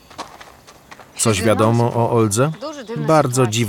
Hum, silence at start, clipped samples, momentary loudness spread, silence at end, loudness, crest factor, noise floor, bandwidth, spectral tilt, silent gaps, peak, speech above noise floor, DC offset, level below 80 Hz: none; 0.2 s; under 0.1%; 19 LU; 0 s; -17 LUFS; 16 dB; -44 dBFS; 17.5 kHz; -5 dB/octave; none; -2 dBFS; 28 dB; under 0.1%; -56 dBFS